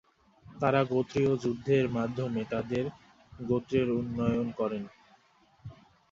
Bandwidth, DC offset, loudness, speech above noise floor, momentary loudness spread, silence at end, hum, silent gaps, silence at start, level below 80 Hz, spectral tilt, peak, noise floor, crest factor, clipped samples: 7.6 kHz; under 0.1%; -30 LUFS; 35 dB; 17 LU; 0.4 s; none; none; 0.45 s; -58 dBFS; -8 dB/octave; -10 dBFS; -64 dBFS; 20 dB; under 0.1%